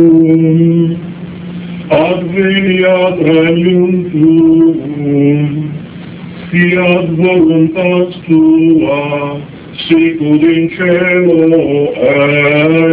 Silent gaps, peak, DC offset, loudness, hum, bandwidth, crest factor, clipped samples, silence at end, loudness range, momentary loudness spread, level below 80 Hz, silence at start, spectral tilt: none; 0 dBFS; under 0.1%; -9 LUFS; none; 4 kHz; 10 dB; 0.4%; 0 s; 2 LU; 15 LU; -44 dBFS; 0 s; -11 dB/octave